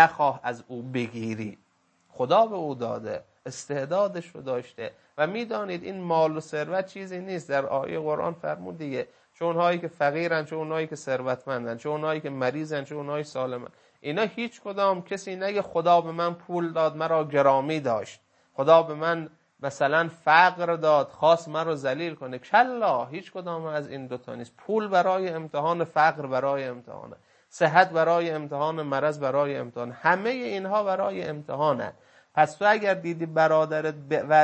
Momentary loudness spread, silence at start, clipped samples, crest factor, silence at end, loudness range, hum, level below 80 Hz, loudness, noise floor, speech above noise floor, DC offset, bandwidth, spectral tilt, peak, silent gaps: 14 LU; 0 s; under 0.1%; 24 dB; 0 s; 6 LU; none; -74 dBFS; -26 LUFS; -65 dBFS; 40 dB; under 0.1%; 8.8 kHz; -5.5 dB/octave; -2 dBFS; none